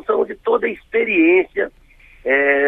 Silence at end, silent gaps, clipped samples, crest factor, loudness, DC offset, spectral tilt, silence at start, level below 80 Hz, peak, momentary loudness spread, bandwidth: 0 s; none; under 0.1%; 14 dB; -17 LUFS; under 0.1%; -7 dB/octave; 0.1 s; -52 dBFS; -4 dBFS; 11 LU; 3.9 kHz